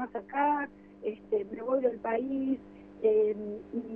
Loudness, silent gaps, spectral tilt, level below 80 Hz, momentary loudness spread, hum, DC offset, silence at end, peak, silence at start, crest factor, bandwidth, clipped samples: -31 LUFS; none; -9 dB/octave; -66 dBFS; 11 LU; 50 Hz at -55 dBFS; under 0.1%; 0 s; -16 dBFS; 0 s; 16 dB; 3.5 kHz; under 0.1%